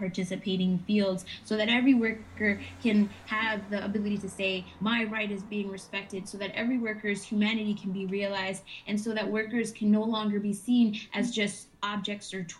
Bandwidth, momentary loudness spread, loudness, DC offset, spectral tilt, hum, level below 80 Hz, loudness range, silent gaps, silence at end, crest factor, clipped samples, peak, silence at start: 12 kHz; 9 LU; -30 LUFS; under 0.1%; -5 dB/octave; none; -64 dBFS; 4 LU; none; 0 s; 18 dB; under 0.1%; -12 dBFS; 0 s